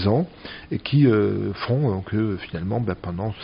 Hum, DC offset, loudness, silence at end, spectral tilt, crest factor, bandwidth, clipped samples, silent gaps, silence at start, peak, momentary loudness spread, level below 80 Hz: none; under 0.1%; -23 LUFS; 0 s; -7 dB/octave; 16 dB; 5.4 kHz; under 0.1%; none; 0 s; -8 dBFS; 12 LU; -50 dBFS